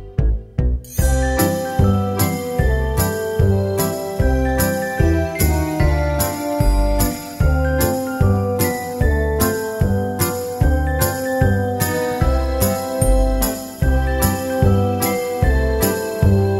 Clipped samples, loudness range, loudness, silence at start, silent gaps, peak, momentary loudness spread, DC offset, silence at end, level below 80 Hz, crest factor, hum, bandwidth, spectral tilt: under 0.1%; 1 LU; -19 LUFS; 0 s; none; -2 dBFS; 3 LU; under 0.1%; 0 s; -22 dBFS; 16 dB; none; 16.5 kHz; -5.5 dB/octave